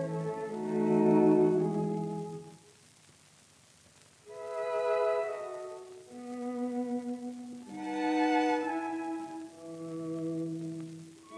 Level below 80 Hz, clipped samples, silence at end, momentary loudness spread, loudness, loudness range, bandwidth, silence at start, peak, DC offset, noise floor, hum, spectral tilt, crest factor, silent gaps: -80 dBFS; under 0.1%; 0 s; 19 LU; -32 LUFS; 7 LU; 11 kHz; 0 s; -14 dBFS; under 0.1%; -61 dBFS; none; -7 dB/octave; 18 dB; none